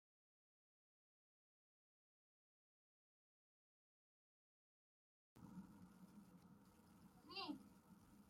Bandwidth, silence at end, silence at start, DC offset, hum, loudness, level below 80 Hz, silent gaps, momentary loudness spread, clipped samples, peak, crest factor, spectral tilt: 16 kHz; 0 s; 5.35 s; under 0.1%; none; -59 LUFS; -88 dBFS; none; 17 LU; under 0.1%; -38 dBFS; 26 dB; -5 dB/octave